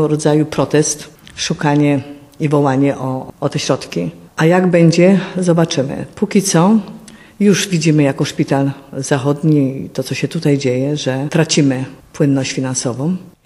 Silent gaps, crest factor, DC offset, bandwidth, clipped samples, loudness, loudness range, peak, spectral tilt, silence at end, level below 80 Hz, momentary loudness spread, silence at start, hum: none; 14 dB; under 0.1%; 13.5 kHz; under 0.1%; -15 LUFS; 3 LU; 0 dBFS; -5.5 dB/octave; 0.15 s; -52 dBFS; 11 LU; 0 s; none